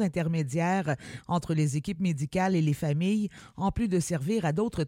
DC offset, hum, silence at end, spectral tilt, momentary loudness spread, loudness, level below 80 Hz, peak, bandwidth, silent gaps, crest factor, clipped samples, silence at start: under 0.1%; none; 0 s; -6.5 dB/octave; 5 LU; -29 LUFS; -50 dBFS; -14 dBFS; 16 kHz; none; 14 dB; under 0.1%; 0 s